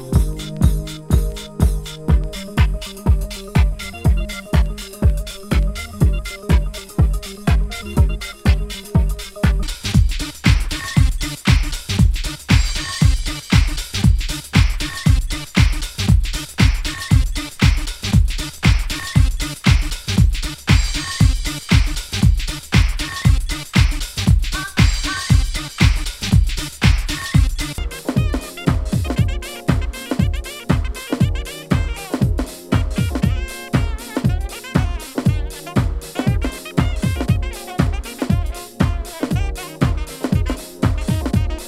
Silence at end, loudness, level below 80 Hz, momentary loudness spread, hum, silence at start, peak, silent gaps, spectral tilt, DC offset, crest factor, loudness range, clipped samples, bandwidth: 0 s; -19 LUFS; -20 dBFS; 6 LU; none; 0 s; 0 dBFS; none; -5.5 dB/octave; under 0.1%; 16 dB; 3 LU; under 0.1%; 16 kHz